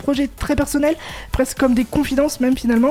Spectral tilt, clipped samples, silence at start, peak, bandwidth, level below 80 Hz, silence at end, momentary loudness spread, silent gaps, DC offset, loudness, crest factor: -5 dB/octave; under 0.1%; 0 s; -4 dBFS; 16.5 kHz; -32 dBFS; 0 s; 5 LU; none; under 0.1%; -19 LUFS; 14 dB